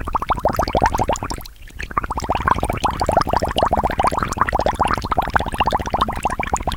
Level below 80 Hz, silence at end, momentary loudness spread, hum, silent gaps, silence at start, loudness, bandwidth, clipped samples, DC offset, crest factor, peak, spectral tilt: -30 dBFS; 0 s; 6 LU; none; none; 0 s; -20 LUFS; 18.5 kHz; under 0.1%; under 0.1%; 20 dB; 0 dBFS; -5 dB/octave